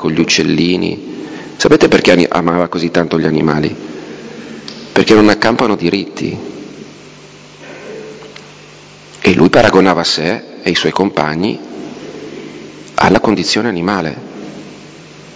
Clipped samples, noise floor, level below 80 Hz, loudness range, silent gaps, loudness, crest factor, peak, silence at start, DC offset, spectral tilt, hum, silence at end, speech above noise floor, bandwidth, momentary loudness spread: 1%; -37 dBFS; -42 dBFS; 5 LU; none; -12 LUFS; 14 dB; 0 dBFS; 0 s; under 0.1%; -5 dB/octave; 50 Hz at -45 dBFS; 0 s; 25 dB; 8 kHz; 22 LU